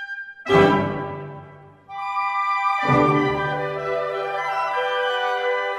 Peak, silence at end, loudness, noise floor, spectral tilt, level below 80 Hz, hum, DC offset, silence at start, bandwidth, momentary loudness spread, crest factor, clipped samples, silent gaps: -2 dBFS; 0 s; -21 LUFS; -44 dBFS; -6.5 dB/octave; -52 dBFS; none; under 0.1%; 0 s; 12.5 kHz; 15 LU; 20 dB; under 0.1%; none